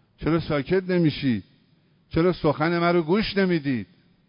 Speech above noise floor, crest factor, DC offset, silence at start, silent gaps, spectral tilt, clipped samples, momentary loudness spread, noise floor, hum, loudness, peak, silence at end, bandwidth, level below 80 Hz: 39 dB; 16 dB; under 0.1%; 0.2 s; none; -11.5 dB/octave; under 0.1%; 8 LU; -61 dBFS; none; -23 LUFS; -8 dBFS; 0.45 s; 5.4 kHz; -48 dBFS